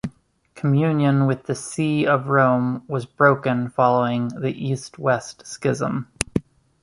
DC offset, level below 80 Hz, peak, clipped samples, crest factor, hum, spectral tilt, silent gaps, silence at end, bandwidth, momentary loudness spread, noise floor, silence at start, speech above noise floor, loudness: under 0.1%; -50 dBFS; 0 dBFS; under 0.1%; 22 dB; none; -6.5 dB/octave; none; 0.45 s; 11.5 kHz; 10 LU; -52 dBFS; 0.05 s; 31 dB; -21 LUFS